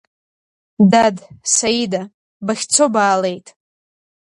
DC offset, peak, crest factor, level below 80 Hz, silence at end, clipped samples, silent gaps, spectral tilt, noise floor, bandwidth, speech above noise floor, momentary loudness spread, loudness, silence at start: under 0.1%; 0 dBFS; 18 dB; -58 dBFS; 0.9 s; under 0.1%; 2.14-2.40 s; -3.5 dB/octave; under -90 dBFS; 11.5 kHz; over 74 dB; 14 LU; -16 LUFS; 0.8 s